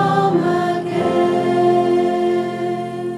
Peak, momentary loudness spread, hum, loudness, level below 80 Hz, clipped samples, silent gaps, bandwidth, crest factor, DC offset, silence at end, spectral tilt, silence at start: -4 dBFS; 7 LU; none; -17 LUFS; -58 dBFS; under 0.1%; none; 10.5 kHz; 14 dB; under 0.1%; 0 s; -7 dB/octave; 0 s